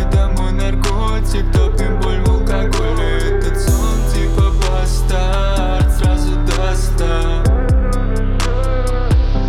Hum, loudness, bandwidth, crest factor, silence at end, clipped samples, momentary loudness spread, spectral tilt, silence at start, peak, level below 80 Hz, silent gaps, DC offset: none; -17 LUFS; 14 kHz; 12 dB; 0 s; under 0.1%; 3 LU; -6 dB/octave; 0 s; 0 dBFS; -14 dBFS; none; under 0.1%